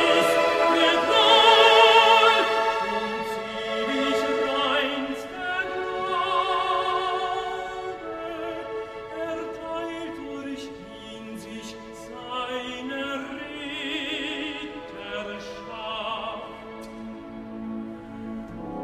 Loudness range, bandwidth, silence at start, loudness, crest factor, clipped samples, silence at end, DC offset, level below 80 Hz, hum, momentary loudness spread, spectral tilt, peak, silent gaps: 17 LU; 15.5 kHz; 0 s; -23 LUFS; 22 dB; under 0.1%; 0 s; under 0.1%; -56 dBFS; none; 22 LU; -2.5 dB/octave; -4 dBFS; none